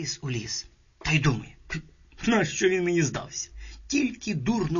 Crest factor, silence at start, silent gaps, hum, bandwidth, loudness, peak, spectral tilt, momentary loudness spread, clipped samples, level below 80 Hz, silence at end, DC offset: 16 dB; 0 s; none; none; 7.4 kHz; -27 LUFS; -10 dBFS; -4.5 dB/octave; 13 LU; under 0.1%; -46 dBFS; 0 s; under 0.1%